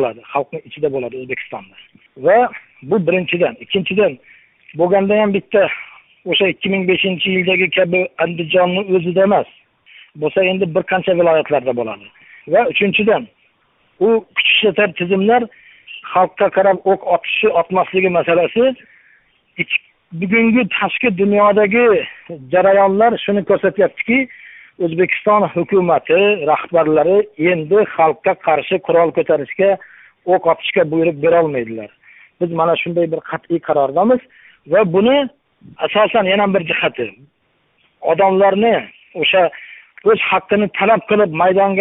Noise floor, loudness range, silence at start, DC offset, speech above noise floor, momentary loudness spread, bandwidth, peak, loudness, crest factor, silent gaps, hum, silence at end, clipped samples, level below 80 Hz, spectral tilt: -61 dBFS; 3 LU; 0 s; under 0.1%; 46 dB; 11 LU; 3.9 kHz; 0 dBFS; -15 LUFS; 16 dB; none; none; 0 s; under 0.1%; -58 dBFS; -10.5 dB/octave